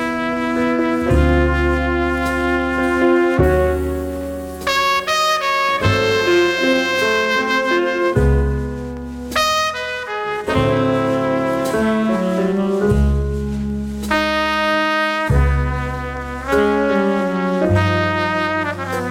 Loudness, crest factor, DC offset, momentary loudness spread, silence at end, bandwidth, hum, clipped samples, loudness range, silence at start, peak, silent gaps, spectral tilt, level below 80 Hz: -17 LUFS; 16 dB; under 0.1%; 8 LU; 0 s; 17 kHz; none; under 0.1%; 3 LU; 0 s; -2 dBFS; none; -5.5 dB/octave; -26 dBFS